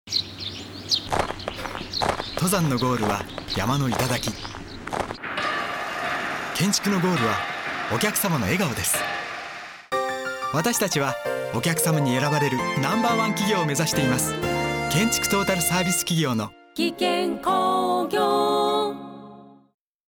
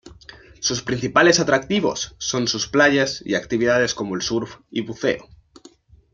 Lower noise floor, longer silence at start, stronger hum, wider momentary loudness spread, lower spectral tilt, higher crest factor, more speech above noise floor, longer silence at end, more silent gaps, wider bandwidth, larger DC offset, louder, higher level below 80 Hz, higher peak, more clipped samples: second, -46 dBFS vs -50 dBFS; about the same, 0.05 s vs 0.05 s; neither; about the same, 9 LU vs 11 LU; about the same, -4 dB/octave vs -3.5 dB/octave; second, 14 dB vs 20 dB; second, 23 dB vs 30 dB; second, 0.55 s vs 0.9 s; neither; first, over 20 kHz vs 7.8 kHz; neither; second, -24 LUFS vs -20 LUFS; about the same, -48 dBFS vs -52 dBFS; second, -10 dBFS vs 0 dBFS; neither